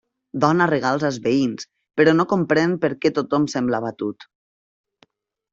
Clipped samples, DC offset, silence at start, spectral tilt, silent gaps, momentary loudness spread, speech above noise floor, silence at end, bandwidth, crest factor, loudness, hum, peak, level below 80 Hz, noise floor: under 0.1%; under 0.1%; 0.35 s; -6 dB/octave; none; 12 LU; 41 dB; 1.3 s; 7.8 kHz; 18 dB; -20 LUFS; none; -2 dBFS; -62 dBFS; -60 dBFS